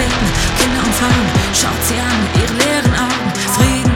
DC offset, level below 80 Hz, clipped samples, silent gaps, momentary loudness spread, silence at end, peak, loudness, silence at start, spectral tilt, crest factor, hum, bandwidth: under 0.1%; -24 dBFS; under 0.1%; none; 3 LU; 0 s; -2 dBFS; -14 LUFS; 0 s; -4 dB/octave; 12 dB; none; 19 kHz